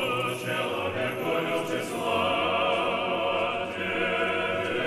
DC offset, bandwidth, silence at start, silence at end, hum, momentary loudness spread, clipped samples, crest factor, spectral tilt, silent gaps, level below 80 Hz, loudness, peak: under 0.1%; 15.5 kHz; 0 s; 0 s; none; 4 LU; under 0.1%; 14 dB; -4.5 dB/octave; none; -64 dBFS; -27 LUFS; -12 dBFS